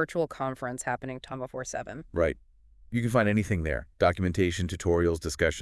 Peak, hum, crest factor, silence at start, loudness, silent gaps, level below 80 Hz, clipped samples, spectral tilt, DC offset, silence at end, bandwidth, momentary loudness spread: -10 dBFS; none; 20 dB; 0 s; -29 LUFS; none; -46 dBFS; under 0.1%; -6 dB/octave; under 0.1%; 0 s; 12 kHz; 11 LU